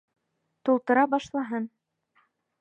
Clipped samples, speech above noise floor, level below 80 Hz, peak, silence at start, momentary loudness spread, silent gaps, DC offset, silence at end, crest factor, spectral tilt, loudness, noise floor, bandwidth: under 0.1%; 44 dB; -72 dBFS; -8 dBFS; 0.65 s; 11 LU; none; under 0.1%; 0.95 s; 20 dB; -5.5 dB/octave; -26 LUFS; -69 dBFS; 8.2 kHz